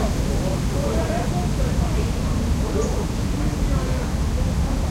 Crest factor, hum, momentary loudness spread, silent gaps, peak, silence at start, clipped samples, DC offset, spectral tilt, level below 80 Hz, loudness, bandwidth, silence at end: 12 dB; none; 2 LU; none; -8 dBFS; 0 s; under 0.1%; under 0.1%; -6 dB/octave; -24 dBFS; -23 LUFS; 16 kHz; 0 s